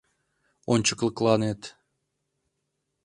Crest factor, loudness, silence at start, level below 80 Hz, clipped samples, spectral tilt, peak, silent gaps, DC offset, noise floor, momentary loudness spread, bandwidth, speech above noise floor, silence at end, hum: 22 dB; -25 LUFS; 0.7 s; -62 dBFS; under 0.1%; -4.5 dB/octave; -6 dBFS; none; under 0.1%; -79 dBFS; 18 LU; 11 kHz; 55 dB; 1.35 s; none